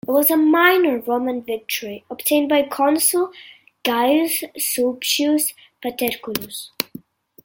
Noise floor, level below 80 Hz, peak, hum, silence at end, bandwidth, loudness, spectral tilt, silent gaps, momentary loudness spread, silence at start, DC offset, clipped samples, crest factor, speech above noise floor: -42 dBFS; -66 dBFS; 0 dBFS; none; 0.6 s; 17 kHz; -19 LUFS; -2 dB/octave; none; 13 LU; 0.05 s; under 0.1%; under 0.1%; 20 dB; 23 dB